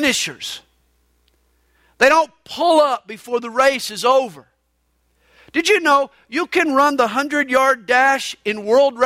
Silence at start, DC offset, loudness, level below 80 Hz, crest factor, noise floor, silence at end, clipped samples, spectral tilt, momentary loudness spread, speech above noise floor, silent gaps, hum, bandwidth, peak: 0 s; under 0.1%; -17 LUFS; -60 dBFS; 16 dB; -66 dBFS; 0 s; under 0.1%; -2 dB/octave; 11 LU; 49 dB; none; 60 Hz at -55 dBFS; 16 kHz; -2 dBFS